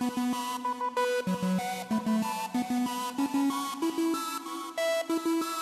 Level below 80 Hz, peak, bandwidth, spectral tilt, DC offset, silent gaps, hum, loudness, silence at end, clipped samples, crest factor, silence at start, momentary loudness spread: -72 dBFS; -18 dBFS; 14 kHz; -4.5 dB/octave; under 0.1%; none; none; -30 LUFS; 0 s; under 0.1%; 12 dB; 0 s; 3 LU